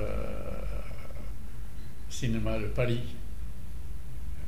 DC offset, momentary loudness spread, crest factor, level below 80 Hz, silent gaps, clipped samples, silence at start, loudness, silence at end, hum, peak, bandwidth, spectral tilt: 4%; 14 LU; 18 dB; -40 dBFS; none; under 0.1%; 0 s; -37 LUFS; 0 s; none; -16 dBFS; 15.5 kHz; -6 dB/octave